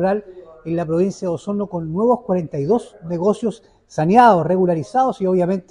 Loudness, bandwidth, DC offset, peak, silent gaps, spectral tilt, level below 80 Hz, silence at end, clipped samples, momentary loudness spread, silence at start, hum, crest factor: -18 LUFS; 10.5 kHz; under 0.1%; -2 dBFS; none; -7.5 dB/octave; -54 dBFS; 0.1 s; under 0.1%; 12 LU; 0 s; none; 18 dB